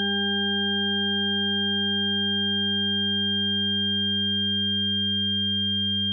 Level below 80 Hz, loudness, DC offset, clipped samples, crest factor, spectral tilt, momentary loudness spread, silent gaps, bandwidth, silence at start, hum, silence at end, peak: -72 dBFS; -22 LUFS; under 0.1%; under 0.1%; 8 dB; -4 dB/octave; 0 LU; none; 3.4 kHz; 0 s; none; 0 s; -16 dBFS